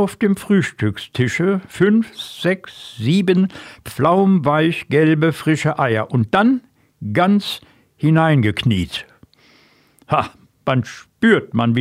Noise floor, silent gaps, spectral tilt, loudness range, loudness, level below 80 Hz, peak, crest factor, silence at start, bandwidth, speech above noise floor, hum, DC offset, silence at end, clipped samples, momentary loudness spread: -53 dBFS; none; -7 dB/octave; 4 LU; -17 LUFS; -50 dBFS; -2 dBFS; 16 dB; 0 s; 15.5 kHz; 37 dB; none; under 0.1%; 0 s; under 0.1%; 12 LU